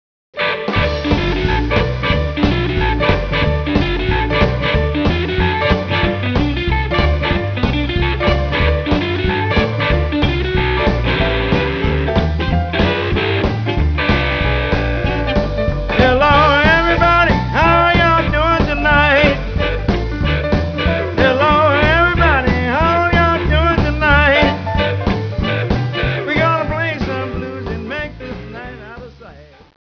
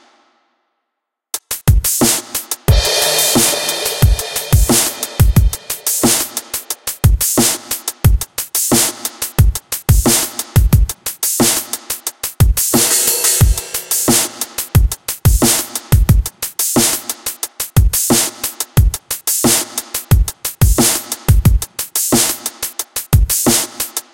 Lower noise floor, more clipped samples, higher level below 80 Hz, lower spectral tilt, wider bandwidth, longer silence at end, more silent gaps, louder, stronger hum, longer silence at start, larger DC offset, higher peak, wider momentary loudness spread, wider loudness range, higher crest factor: second, -39 dBFS vs -77 dBFS; neither; about the same, -22 dBFS vs -20 dBFS; first, -7 dB/octave vs -3.5 dB/octave; second, 5.4 kHz vs 17.5 kHz; first, 0.45 s vs 0.15 s; neither; about the same, -15 LUFS vs -14 LUFS; neither; second, 0.35 s vs 1.35 s; neither; about the same, 0 dBFS vs 0 dBFS; about the same, 8 LU vs 10 LU; first, 5 LU vs 2 LU; about the same, 14 dB vs 14 dB